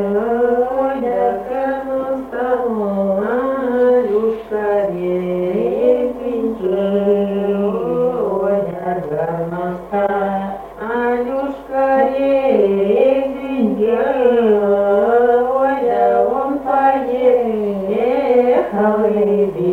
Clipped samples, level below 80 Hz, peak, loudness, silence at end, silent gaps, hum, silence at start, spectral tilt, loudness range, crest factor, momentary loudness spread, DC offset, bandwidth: under 0.1%; -48 dBFS; -2 dBFS; -16 LUFS; 0 s; none; none; 0 s; -8.5 dB/octave; 4 LU; 14 dB; 7 LU; under 0.1%; 4.6 kHz